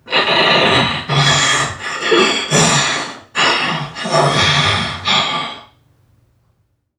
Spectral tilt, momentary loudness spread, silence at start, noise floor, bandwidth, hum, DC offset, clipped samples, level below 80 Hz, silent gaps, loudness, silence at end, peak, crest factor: -3 dB/octave; 10 LU; 0.05 s; -62 dBFS; 14.5 kHz; none; under 0.1%; under 0.1%; -46 dBFS; none; -13 LUFS; 1.35 s; 0 dBFS; 16 dB